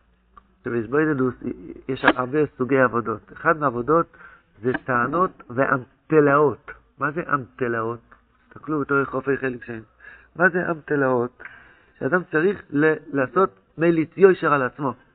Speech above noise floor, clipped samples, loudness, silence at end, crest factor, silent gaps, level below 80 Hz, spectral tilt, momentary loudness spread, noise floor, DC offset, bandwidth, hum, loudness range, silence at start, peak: 33 dB; under 0.1%; -22 LUFS; 0.2 s; 22 dB; none; -56 dBFS; -5.5 dB/octave; 14 LU; -54 dBFS; under 0.1%; 4.5 kHz; none; 4 LU; 0.65 s; -2 dBFS